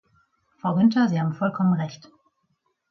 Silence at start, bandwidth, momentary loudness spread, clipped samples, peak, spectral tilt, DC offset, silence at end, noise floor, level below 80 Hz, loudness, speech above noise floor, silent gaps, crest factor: 0.65 s; 6.2 kHz; 10 LU; under 0.1%; -8 dBFS; -8 dB/octave; under 0.1%; 0.95 s; -72 dBFS; -68 dBFS; -23 LUFS; 51 dB; none; 16 dB